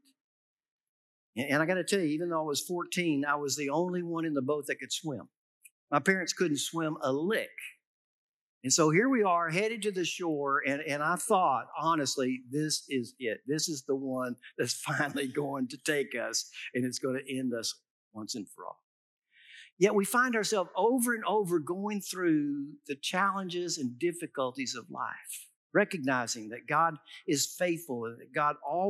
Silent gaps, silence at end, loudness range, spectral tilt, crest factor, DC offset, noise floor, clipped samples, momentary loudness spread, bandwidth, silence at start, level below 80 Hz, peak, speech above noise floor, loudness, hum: 5.37-5.61 s, 5.71-5.88 s, 7.85-8.61 s, 17.90-18.11 s, 18.83-19.17 s, 19.72-19.77 s, 25.56-25.70 s; 0 s; 4 LU; -3.5 dB/octave; 22 dB; under 0.1%; -55 dBFS; under 0.1%; 11 LU; 16 kHz; 1.35 s; under -90 dBFS; -10 dBFS; 24 dB; -31 LUFS; none